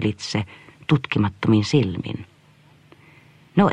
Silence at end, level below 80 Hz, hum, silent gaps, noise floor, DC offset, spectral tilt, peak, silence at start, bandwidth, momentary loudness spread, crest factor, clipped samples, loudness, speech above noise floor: 0 s; -54 dBFS; none; none; -53 dBFS; under 0.1%; -6.5 dB/octave; -4 dBFS; 0 s; 9.8 kHz; 15 LU; 20 dB; under 0.1%; -22 LUFS; 32 dB